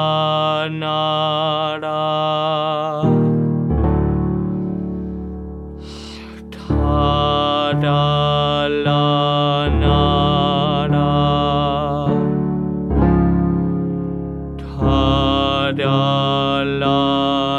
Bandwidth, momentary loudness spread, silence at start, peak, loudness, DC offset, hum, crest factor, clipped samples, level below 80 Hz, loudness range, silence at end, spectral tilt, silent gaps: 8 kHz; 11 LU; 0 s; -2 dBFS; -17 LUFS; under 0.1%; none; 14 dB; under 0.1%; -30 dBFS; 5 LU; 0 s; -8 dB/octave; none